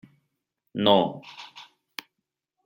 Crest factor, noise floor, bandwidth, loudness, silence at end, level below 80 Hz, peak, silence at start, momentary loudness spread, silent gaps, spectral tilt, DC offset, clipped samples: 24 dB; -83 dBFS; 16.5 kHz; -22 LUFS; 1.05 s; -74 dBFS; -6 dBFS; 0.75 s; 22 LU; none; -6 dB/octave; under 0.1%; under 0.1%